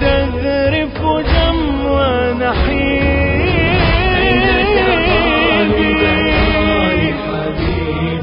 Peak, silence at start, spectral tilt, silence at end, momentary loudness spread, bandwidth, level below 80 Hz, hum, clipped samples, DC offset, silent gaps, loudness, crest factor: 0 dBFS; 0 s; -10.5 dB/octave; 0 s; 6 LU; 5.4 kHz; -22 dBFS; none; under 0.1%; under 0.1%; none; -14 LUFS; 14 dB